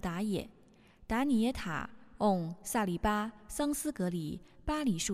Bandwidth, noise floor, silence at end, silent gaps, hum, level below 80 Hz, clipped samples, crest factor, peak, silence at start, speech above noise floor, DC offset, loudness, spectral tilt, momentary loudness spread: 15 kHz; -60 dBFS; 0 s; none; none; -50 dBFS; under 0.1%; 18 dB; -16 dBFS; 0.05 s; 27 dB; under 0.1%; -34 LUFS; -5 dB/octave; 9 LU